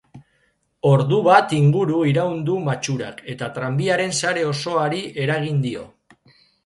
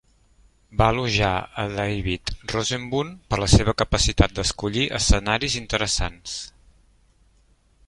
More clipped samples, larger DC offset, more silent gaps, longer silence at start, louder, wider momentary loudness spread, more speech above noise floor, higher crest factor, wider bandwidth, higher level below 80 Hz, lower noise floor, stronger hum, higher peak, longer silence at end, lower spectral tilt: neither; neither; neither; second, 0.15 s vs 0.7 s; first, -20 LUFS vs -23 LUFS; first, 13 LU vs 10 LU; first, 46 dB vs 37 dB; about the same, 20 dB vs 22 dB; about the same, 11.5 kHz vs 11.5 kHz; second, -60 dBFS vs -32 dBFS; first, -65 dBFS vs -60 dBFS; neither; about the same, 0 dBFS vs -2 dBFS; second, 0.8 s vs 1.4 s; first, -5.5 dB/octave vs -4 dB/octave